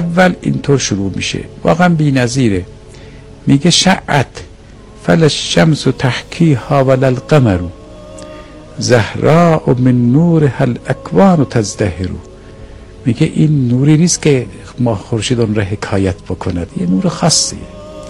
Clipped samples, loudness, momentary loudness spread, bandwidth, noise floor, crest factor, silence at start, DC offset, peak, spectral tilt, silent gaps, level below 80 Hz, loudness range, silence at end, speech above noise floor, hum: 0.3%; -12 LUFS; 13 LU; 11.5 kHz; -35 dBFS; 12 dB; 0 s; under 0.1%; 0 dBFS; -5.5 dB/octave; none; -38 dBFS; 3 LU; 0 s; 24 dB; none